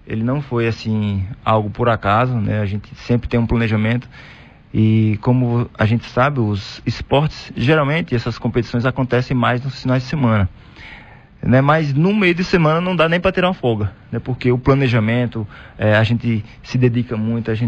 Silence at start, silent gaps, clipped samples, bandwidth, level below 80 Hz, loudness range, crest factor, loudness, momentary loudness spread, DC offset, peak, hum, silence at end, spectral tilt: 0.05 s; none; under 0.1%; 7.2 kHz; -38 dBFS; 3 LU; 14 dB; -18 LUFS; 9 LU; under 0.1%; -2 dBFS; none; 0 s; -8 dB/octave